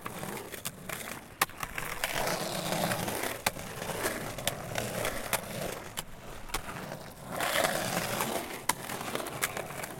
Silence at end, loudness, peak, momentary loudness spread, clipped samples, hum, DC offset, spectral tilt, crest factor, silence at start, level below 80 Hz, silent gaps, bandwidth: 0 s; -34 LUFS; -8 dBFS; 9 LU; under 0.1%; none; under 0.1%; -2.5 dB/octave; 28 dB; 0 s; -52 dBFS; none; 17 kHz